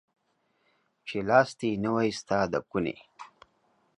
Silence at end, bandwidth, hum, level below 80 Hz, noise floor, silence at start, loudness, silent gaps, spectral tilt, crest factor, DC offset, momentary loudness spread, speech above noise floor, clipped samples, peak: 0.7 s; 11 kHz; none; -62 dBFS; -73 dBFS; 1.05 s; -28 LUFS; none; -5.5 dB/octave; 24 dB; under 0.1%; 21 LU; 46 dB; under 0.1%; -8 dBFS